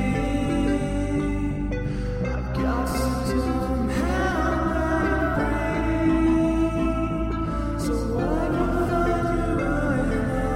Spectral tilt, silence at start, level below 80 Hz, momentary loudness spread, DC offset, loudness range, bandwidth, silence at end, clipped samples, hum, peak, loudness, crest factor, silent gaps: -7 dB/octave; 0 s; -30 dBFS; 5 LU; under 0.1%; 3 LU; 16 kHz; 0 s; under 0.1%; none; -10 dBFS; -24 LUFS; 14 dB; none